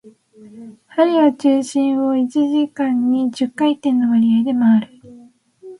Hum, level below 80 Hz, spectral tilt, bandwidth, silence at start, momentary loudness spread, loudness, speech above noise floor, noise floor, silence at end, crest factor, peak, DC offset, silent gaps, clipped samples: none; -66 dBFS; -6 dB/octave; 11 kHz; 0.05 s; 4 LU; -17 LUFS; 30 dB; -46 dBFS; 0.05 s; 14 dB; -2 dBFS; under 0.1%; none; under 0.1%